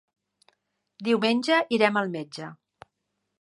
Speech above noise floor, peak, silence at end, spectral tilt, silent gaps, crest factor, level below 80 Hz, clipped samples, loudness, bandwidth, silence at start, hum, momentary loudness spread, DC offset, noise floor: 55 dB; -4 dBFS; 0.85 s; -5 dB/octave; none; 22 dB; -76 dBFS; under 0.1%; -24 LUFS; 11.5 kHz; 1 s; none; 17 LU; under 0.1%; -80 dBFS